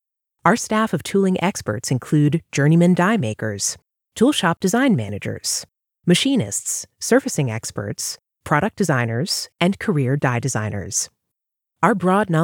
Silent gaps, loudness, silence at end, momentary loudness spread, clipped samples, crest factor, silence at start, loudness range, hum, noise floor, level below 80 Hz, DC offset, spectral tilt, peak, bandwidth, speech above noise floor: none; -20 LUFS; 0 s; 9 LU; under 0.1%; 18 dB; 0.45 s; 3 LU; none; -82 dBFS; -56 dBFS; under 0.1%; -5 dB/octave; 0 dBFS; 19.5 kHz; 63 dB